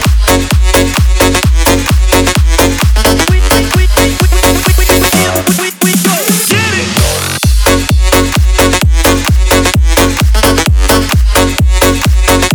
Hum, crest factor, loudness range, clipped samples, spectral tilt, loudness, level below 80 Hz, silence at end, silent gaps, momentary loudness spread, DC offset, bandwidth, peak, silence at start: none; 8 dB; 1 LU; 0.4%; -4 dB/octave; -9 LUFS; -12 dBFS; 0 s; none; 2 LU; under 0.1%; over 20 kHz; 0 dBFS; 0 s